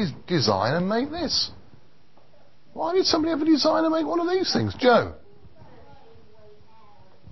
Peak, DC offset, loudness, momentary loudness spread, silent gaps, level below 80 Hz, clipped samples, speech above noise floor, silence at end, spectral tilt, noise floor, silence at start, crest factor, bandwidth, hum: -6 dBFS; 0.6%; -23 LUFS; 6 LU; none; -52 dBFS; under 0.1%; 36 dB; 2.15 s; -5 dB/octave; -59 dBFS; 0 s; 20 dB; 6.2 kHz; none